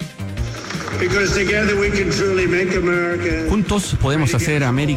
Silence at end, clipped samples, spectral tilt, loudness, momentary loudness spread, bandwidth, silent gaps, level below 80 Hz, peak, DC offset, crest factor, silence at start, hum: 0 s; under 0.1%; -5.5 dB/octave; -18 LUFS; 10 LU; 16 kHz; none; -32 dBFS; -8 dBFS; under 0.1%; 10 dB; 0 s; none